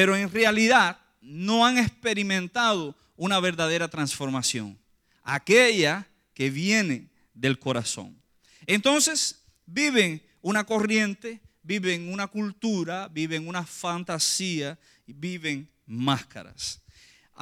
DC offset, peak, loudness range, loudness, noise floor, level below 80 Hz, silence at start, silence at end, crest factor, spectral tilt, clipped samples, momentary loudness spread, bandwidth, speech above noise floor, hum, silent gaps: under 0.1%; -6 dBFS; 5 LU; -25 LUFS; -56 dBFS; -64 dBFS; 0 s; 0 s; 20 dB; -3.5 dB/octave; under 0.1%; 15 LU; 16.5 kHz; 31 dB; none; none